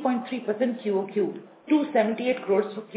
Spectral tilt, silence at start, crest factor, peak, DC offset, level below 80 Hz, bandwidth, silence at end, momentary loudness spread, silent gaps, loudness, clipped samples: -10 dB/octave; 0 s; 18 dB; -8 dBFS; under 0.1%; -82 dBFS; 4 kHz; 0 s; 6 LU; none; -26 LUFS; under 0.1%